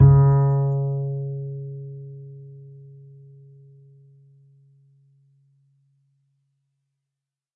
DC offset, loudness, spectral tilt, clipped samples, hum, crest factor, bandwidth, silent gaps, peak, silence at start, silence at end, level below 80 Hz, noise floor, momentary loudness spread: under 0.1%; -21 LUFS; -15 dB/octave; under 0.1%; none; 22 dB; 1.9 kHz; none; -4 dBFS; 0 s; 4.9 s; -44 dBFS; -87 dBFS; 28 LU